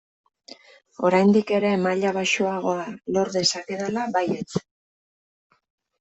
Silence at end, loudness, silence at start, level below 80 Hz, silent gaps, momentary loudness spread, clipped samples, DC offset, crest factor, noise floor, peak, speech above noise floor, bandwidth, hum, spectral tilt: 1.4 s; -23 LUFS; 1 s; -66 dBFS; none; 10 LU; under 0.1%; under 0.1%; 18 dB; -48 dBFS; -6 dBFS; 26 dB; 8.4 kHz; none; -4.5 dB/octave